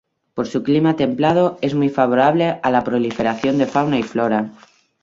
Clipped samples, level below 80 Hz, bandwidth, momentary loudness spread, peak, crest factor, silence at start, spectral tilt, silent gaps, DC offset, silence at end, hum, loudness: under 0.1%; -56 dBFS; 7.6 kHz; 7 LU; -2 dBFS; 16 dB; 0.35 s; -7 dB/octave; none; under 0.1%; 0.5 s; none; -18 LUFS